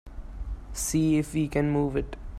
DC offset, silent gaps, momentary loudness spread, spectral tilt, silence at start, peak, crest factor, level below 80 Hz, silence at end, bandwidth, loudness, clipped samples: under 0.1%; none; 16 LU; -6 dB/octave; 0.05 s; -12 dBFS; 16 dB; -38 dBFS; 0 s; 15 kHz; -27 LUFS; under 0.1%